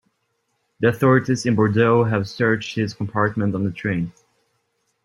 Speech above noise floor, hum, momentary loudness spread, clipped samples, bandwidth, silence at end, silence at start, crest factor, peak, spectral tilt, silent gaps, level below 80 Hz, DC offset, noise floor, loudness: 52 dB; none; 8 LU; under 0.1%; 14 kHz; 0.95 s; 0.8 s; 18 dB; -2 dBFS; -7 dB/octave; none; -56 dBFS; under 0.1%; -71 dBFS; -20 LUFS